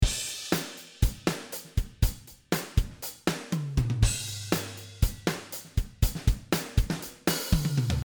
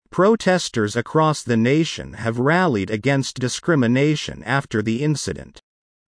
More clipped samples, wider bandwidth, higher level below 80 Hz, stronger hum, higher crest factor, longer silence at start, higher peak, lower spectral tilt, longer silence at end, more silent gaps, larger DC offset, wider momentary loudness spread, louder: neither; first, over 20 kHz vs 10.5 kHz; first, -32 dBFS vs -52 dBFS; neither; about the same, 20 dB vs 16 dB; second, 0 s vs 0.15 s; second, -8 dBFS vs -4 dBFS; about the same, -4.5 dB/octave vs -5.5 dB/octave; second, 0.05 s vs 0.5 s; neither; neither; about the same, 7 LU vs 8 LU; second, -30 LUFS vs -20 LUFS